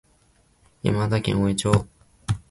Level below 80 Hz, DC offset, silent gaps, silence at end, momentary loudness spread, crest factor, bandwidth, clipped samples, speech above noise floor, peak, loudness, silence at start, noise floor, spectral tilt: -44 dBFS; under 0.1%; none; 0.1 s; 12 LU; 22 dB; 11.5 kHz; under 0.1%; 39 dB; -2 dBFS; -24 LUFS; 0.85 s; -61 dBFS; -6 dB/octave